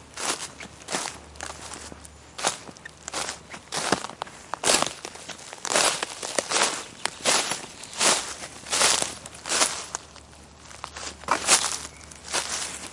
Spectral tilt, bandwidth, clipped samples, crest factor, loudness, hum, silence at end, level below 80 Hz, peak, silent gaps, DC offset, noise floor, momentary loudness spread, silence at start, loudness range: 0 dB/octave; 11.5 kHz; under 0.1%; 26 dB; -25 LUFS; none; 0 s; -58 dBFS; -2 dBFS; none; under 0.1%; -48 dBFS; 19 LU; 0 s; 8 LU